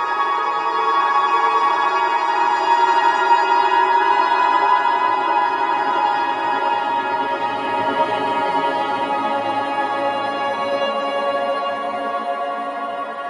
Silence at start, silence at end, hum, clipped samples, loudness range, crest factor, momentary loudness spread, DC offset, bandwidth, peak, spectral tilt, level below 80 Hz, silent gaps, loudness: 0 s; 0 s; none; under 0.1%; 5 LU; 14 dB; 7 LU; under 0.1%; 10.5 kHz; -4 dBFS; -3.5 dB/octave; -76 dBFS; none; -18 LUFS